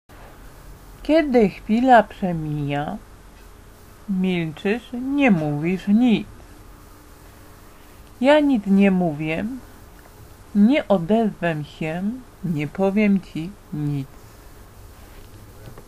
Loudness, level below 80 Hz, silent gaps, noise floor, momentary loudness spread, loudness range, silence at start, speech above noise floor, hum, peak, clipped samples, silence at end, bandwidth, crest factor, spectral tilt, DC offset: -21 LUFS; -46 dBFS; none; -45 dBFS; 15 LU; 4 LU; 0.1 s; 25 dB; none; -2 dBFS; under 0.1%; 0.05 s; 14.5 kHz; 20 dB; -7.5 dB/octave; under 0.1%